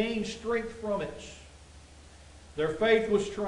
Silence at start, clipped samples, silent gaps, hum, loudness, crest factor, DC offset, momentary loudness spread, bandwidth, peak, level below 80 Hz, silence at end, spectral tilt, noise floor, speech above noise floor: 0 s; under 0.1%; none; none; -30 LUFS; 20 dB; under 0.1%; 19 LU; 11 kHz; -12 dBFS; -54 dBFS; 0 s; -5 dB/octave; -52 dBFS; 22 dB